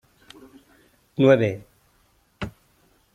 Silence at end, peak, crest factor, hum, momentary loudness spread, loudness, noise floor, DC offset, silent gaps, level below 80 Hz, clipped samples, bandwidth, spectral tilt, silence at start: 0.65 s; -4 dBFS; 22 dB; none; 20 LU; -19 LUFS; -63 dBFS; under 0.1%; none; -56 dBFS; under 0.1%; 13.5 kHz; -7.5 dB/octave; 1.2 s